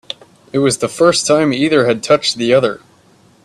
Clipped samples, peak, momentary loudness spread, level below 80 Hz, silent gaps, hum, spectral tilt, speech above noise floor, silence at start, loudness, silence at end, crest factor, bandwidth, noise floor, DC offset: under 0.1%; 0 dBFS; 12 LU; -56 dBFS; none; none; -4 dB/octave; 36 dB; 0.55 s; -14 LUFS; 0.65 s; 14 dB; 13 kHz; -49 dBFS; under 0.1%